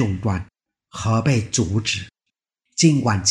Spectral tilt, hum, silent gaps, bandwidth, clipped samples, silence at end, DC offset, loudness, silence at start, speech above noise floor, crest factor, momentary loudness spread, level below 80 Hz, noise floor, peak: -4.5 dB/octave; none; none; 11 kHz; under 0.1%; 0 s; under 0.1%; -20 LUFS; 0 s; 62 dB; 18 dB; 13 LU; -46 dBFS; -81 dBFS; -4 dBFS